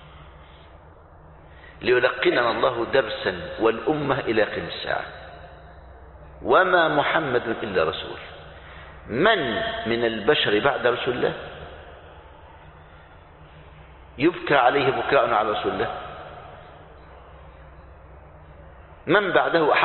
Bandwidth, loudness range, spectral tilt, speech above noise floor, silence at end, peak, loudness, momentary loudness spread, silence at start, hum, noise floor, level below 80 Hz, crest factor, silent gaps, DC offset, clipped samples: 4.4 kHz; 7 LU; -9.5 dB/octave; 26 dB; 0 s; -2 dBFS; -22 LUFS; 22 LU; 0 s; none; -48 dBFS; -50 dBFS; 22 dB; none; under 0.1%; under 0.1%